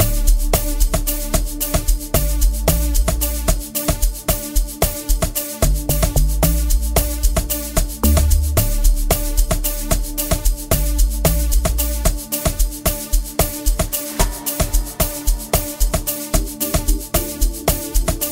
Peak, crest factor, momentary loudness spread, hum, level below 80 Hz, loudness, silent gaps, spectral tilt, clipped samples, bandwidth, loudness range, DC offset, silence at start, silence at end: 0 dBFS; 18 dB; 4 LU; none; -18 dBFS; -19 LUFS; none; -4 dB/octave; under 0.1%; 16.5 kHz; 2 LU; under 0.1%; 0 s; 0 s